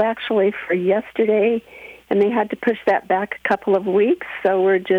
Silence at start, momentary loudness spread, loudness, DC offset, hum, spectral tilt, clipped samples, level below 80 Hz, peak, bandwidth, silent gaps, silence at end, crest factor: 0 s; 5 LU; -19 LUFS; under 0.1%; none; -7.5 dB/octave; under 0.1%; -62 dBFS; -4 dBFS; 5.6 kHz; none; 0 s; 14 dB